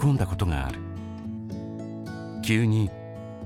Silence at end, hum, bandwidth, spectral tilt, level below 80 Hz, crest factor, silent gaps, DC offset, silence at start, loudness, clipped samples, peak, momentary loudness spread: 0 s; none; 15 kHz; -6.5 dB/octave; -40 dBFS; 18 dB; none; under 0.1%; 0 s; -29 LUFS; under 0.1%; -8 dBFS; 13 LU